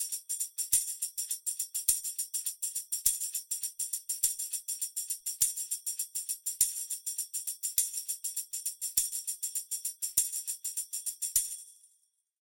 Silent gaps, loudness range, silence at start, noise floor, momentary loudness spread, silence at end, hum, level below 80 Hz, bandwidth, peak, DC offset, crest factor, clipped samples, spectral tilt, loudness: none; 2 LU; 0 s; -73 dBFS; 6 LU; 0.7 s; none; -66 dBFS; 17 kHz; -8 dBFS; under 0.1%; 28 dB; under 0.1%; 3.5 dB/octave; -31 LUFS